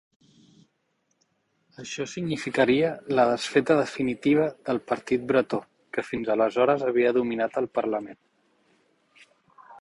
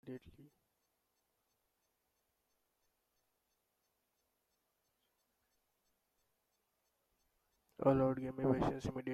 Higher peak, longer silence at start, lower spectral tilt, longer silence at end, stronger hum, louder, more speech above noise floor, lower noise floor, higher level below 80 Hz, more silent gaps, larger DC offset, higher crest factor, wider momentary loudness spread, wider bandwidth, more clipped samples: first, -6 dBFS vs -20 dBFS; first, 1.8 s vs 0.05 s; second, -5.5 dB/octave vs -8.5 dB/octave; about the same, 0 s vs 0 s; neither; first, -25 LUFS vs -36 LUFS; about the same, 49 dB vs 49 dB; second, -73 dBFS vs -84 dBFS; about the same, -64 dBFS vs -66 dBFS; neither; neither; about the same, 20 dB vs 24 dB; second, 11 LU vs 16 LU; second, 11.5 kHz vs 13.5 kHz; neither